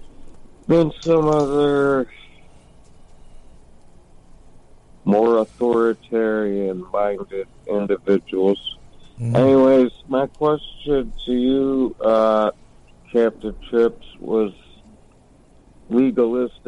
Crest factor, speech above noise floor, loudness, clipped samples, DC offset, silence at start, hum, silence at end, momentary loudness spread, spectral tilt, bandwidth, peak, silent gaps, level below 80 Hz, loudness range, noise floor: 14 dB; 32 dB; -19 LUFS; under 0.1%; under 0.1%; 0 s; none; 0.2 s; 10 LU; -7.5 dB/octave; 10.5 kHz; -6 dBFS; none; -44 dBFS; 5 LU; -51 dBFS